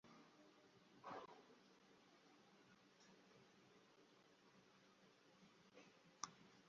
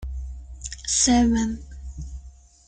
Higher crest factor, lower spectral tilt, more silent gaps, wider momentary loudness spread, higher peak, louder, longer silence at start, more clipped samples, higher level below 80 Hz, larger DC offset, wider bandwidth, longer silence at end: first, 38 dB vs 18 dB; about the same, -2.5 dB/octave vs -3 dB/octave; neither; second, 12 LU vs 21 LU; second, -28 dBFS vs -8 dBFS; second, -60 LUFS vs -21 LUFS; about the same, 0.05 s vs 0 s; neither; second, under -90 dBFS vs -36 dBFS; neither; second, 7.2 kHz vs 9.4 kHz; second, 0 s vs 0.35 s